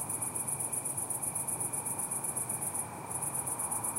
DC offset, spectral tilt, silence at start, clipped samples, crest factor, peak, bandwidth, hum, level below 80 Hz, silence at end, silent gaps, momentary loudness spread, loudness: under 0.1%; -3 dB/octave; 0 s; under 0.1%; 16 dB; -20 dBFS; 16 kHz; none; -68 dBFS; 0 s; none; 2 LU; -33 LUFS